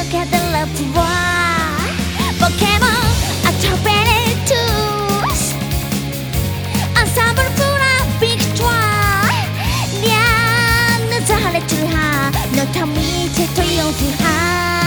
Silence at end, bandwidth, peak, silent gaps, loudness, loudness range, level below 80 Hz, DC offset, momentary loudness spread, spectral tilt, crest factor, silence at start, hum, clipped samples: 0 s; over 20 kHz; 0 dBFS; none; -15 LUFS; 2 LU; -28 dBFS; under 0.1%; 6 LU; -4 dB/octave; 16 dB; 0 s; none; under 0.1%